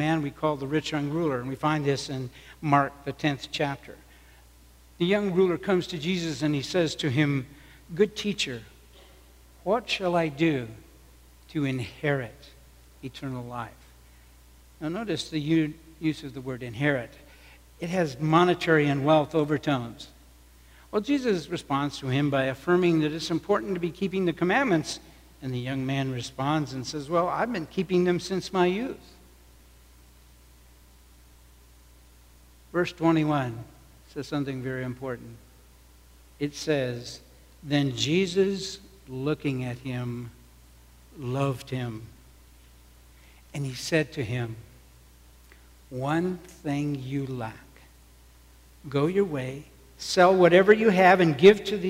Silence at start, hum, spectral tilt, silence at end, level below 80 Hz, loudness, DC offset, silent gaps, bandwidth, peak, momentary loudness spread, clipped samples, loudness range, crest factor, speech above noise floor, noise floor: 0 s; none; -6 dB/octave; 0 s; -54 dBFS; -26 LUFS; under 0.1%; none; 16 kHz; -4 dBFS; 16 LU; under 0.1%; 9 LU; 22 dB; 28 dB; -54 dBFS